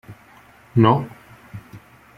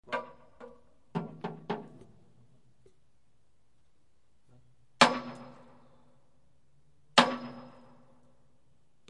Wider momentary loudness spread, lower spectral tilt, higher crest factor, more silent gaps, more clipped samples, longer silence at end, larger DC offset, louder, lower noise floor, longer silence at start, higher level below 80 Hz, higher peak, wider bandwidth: second, 24 LU vs 28 LU; first, -9 dB/octave vs -3 dB/octave; second, 22 dB vs 32 dB; neither; neither; second, 0.4 s vs 1.4 s; second, under 0.1% vs 0.1%; first, -18 LUFS vs -29 LUFS; second, -49 dBFS vs -74 dBFS; about the same, 0.1 s vs 0.1 s; first, -54 dBFS vs -74 dBFS; about the same, -2 dBFS vs -4 dBFS; second, 5.2 kHz vs 11 kHz